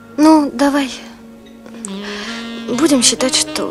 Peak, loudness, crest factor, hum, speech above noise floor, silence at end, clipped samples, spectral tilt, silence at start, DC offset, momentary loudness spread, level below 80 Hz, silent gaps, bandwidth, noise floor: 0 dBFS; -14 LUFS; 16 dB; none; 23 dB; 0 s; under 0.1%; -2 dB/octave; 0 s; under 0.1%; 16 LU; -50 dBFS; none; 14 kHz; -38 dBFS